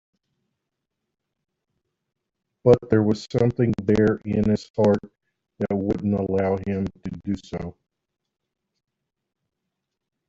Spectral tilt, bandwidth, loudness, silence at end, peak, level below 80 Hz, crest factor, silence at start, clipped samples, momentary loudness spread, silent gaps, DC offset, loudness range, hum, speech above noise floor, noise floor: -8.5 dB/octave; 7.8 kHz; -23 LUFS; 2.6 s; -4 dBFS; -52 dBFS; 22 dB; 2.65 s; under 0.1%; 12 LU; 4.70-4.74 s; under 0.1%; 11 LU; none; 60 dB; -82 dBFS